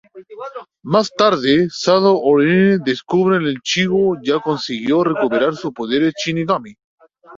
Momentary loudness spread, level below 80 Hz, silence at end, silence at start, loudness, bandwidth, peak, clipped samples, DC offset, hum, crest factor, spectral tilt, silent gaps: 8 LU; -58 dBFS; 0 s; 0.15 s; -16 LUFS; 7.6 kHz; -2 dBFS; under 0.1%; under 0.1%; none; 16 dB; -5.5 dB/octave; 6.84-6.98 s